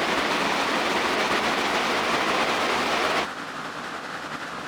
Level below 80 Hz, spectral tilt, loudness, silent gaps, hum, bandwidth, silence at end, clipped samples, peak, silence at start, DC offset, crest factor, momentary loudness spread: -56 dBFS; -2.5 dB/octave; -24 LUFS; none; none; over 20 kHz; 0 s; under 0.1%; -10 dBFS; 0 s; under 0.1%; 14 dB; 10 LU